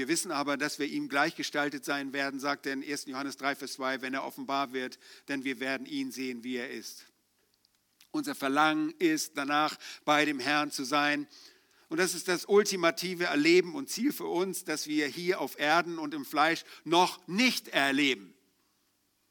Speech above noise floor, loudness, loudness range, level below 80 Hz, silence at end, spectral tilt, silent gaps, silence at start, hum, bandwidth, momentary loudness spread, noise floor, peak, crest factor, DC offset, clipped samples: 43 dB; -30 LUFS; 7 LU; -86 dBFS; 1 s; -3 dB/octave; none; 0 s; none; 19.5 kHz; 10 LU; -74 dBFS; -10 dBFS; 20 dB; under 0.1%; under 0.1%